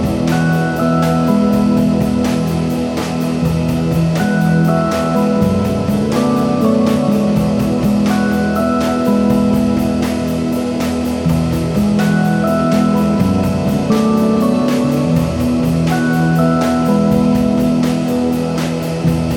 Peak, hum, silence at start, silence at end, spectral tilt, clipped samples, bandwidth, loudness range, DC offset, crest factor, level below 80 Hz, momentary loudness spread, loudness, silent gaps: 0 dBFS; none; 0 s; 0 s; -7 dB/octave; under 0.1%; 17 kHz; 1 LU; under 0.1%; 12 dB; -34 dBFS; 4 LU; -14 LUFS; none